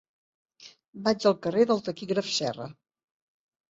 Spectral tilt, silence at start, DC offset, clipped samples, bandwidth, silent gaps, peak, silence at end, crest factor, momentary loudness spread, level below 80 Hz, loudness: -4.5 dB/octave; 0.6 s; under 0.1%; under 0.1%; 8 kHz; 0.88-0.93 s; -8 dBFS; 0.95 s; 20 dB; 15 LU; -68 dBFS; -27 LUFS